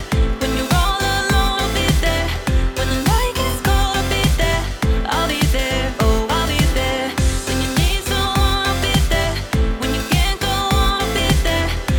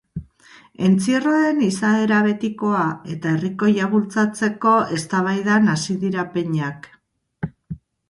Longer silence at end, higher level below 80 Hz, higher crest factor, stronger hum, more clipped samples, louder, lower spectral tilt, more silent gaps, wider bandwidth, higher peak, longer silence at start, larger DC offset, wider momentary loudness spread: second, 0 s vs 0.35 s; first, -22 dBFS vs -54 dBFS; about the same, 14 dB vs 16 dB; neither; neither; about the same, -18 LUFS vs -19 LUFS; second, -4.5 dB/octave vs -6 dB/octave; neither; first, over 20 kHz vs 11.5 kHz; about the same, -4 dBFS vs -4 dBFS; second, 0 s vs 0.15 s; neither; second, 3 LU vs 15 LU